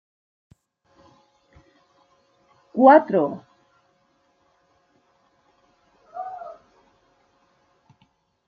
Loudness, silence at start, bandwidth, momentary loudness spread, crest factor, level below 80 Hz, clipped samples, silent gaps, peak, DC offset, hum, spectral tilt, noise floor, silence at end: -18 LUFS; 2.75 s; 5 kHz; 26 LU; 24 dB; -74 dBFS; under 0.1%; none; -2 dBFS; under 0.1%; none; -8.5 dB/octave; -66 dBFS; 1.95 s